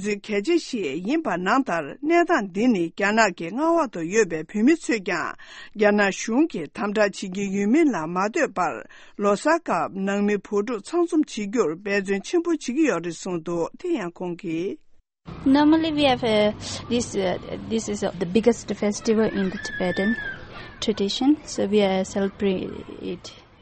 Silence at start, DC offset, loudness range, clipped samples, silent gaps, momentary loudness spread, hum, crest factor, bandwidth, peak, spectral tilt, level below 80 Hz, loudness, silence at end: 0 s; under 0.1%; 3 LU; under 0.1%; none; 10 LU; none; 20 dB; 8.8 kHz; -4 dBFS; -5 dB/octave; -52 dBFS; -23 LUFS; 0.2 s